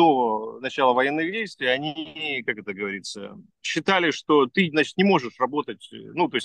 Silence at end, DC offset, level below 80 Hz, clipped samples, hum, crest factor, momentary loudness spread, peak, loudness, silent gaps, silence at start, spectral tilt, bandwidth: 0 s; under 0.1%; -72 dBFS; under 0.1%; none; 20 dB; 13 LU; -4 dBFS; -23 LUFS; none; 0 s; -5 dB/octave; 10 kHz